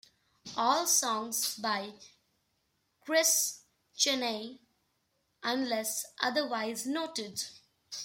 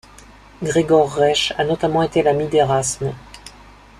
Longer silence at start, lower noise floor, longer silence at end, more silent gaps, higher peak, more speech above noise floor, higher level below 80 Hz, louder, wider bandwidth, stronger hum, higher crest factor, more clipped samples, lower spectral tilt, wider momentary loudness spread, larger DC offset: second, 0.45 s vs 0.6 s; first, -77 dBFS vs -44 dBFS; second, 0 s vs 0.5 s; neither; second, -12 dBFS vs -2 dBFS; first, 46 dB vs 27 dB; second, -80 dBFS vs -46 dBFS; second, -30 LUFS vs -18 LUFS; first, 16.5 kHz vs 13.5 kHz; second, none vs 50 Hz at -45 dBFS; first, 22 dB vs 16 dB; neither; second, -0.5 dB/octave vs -4.5 dB/octave; first, 18 LU vs 13 LU; neither